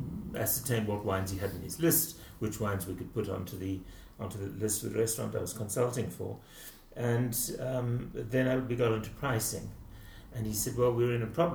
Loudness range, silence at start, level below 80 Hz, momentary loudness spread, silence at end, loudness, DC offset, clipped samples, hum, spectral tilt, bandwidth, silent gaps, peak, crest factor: 3 LU; 0 s; -52 dBFS; 13 LU; 0 s; -33 LUFS; under 0.1%; under 0.1%; none; -5 dB/octave; over 20 kHz; none; -14 dBFS; 18 dB